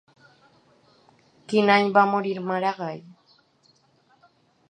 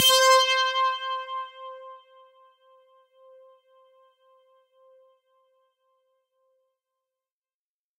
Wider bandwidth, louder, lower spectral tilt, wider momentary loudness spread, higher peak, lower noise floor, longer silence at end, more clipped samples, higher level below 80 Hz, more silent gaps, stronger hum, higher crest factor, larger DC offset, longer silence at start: second, 9.8 kHz vs 16 kHz; about the same, -22 LUFS vs -21 LUFS; first, -6 dB/octave vs 3 dB/octave; second, 16 LU vs 25 LU; first, -4 dBFS vs -8 dBFS; second, -63 dBFS vs under -90 dBFS; second, 1.7 s vs 6.05 s; neither; about the same, -78 dBFS vs -80 dBFS; neither; neither; about the same, 22 dB vs 22 dB; neither; first, 1.5 s vs 0 s